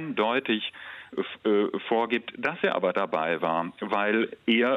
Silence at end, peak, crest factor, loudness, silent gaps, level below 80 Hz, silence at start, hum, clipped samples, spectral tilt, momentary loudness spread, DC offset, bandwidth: 0 s; -10 dBFS; 16 dB; -27 LUFS; none; -74 dBFS; 0 s; none; under 0.1%; -6.5 dB/octave; 8 LU; under 0.1%; 6.6 kHz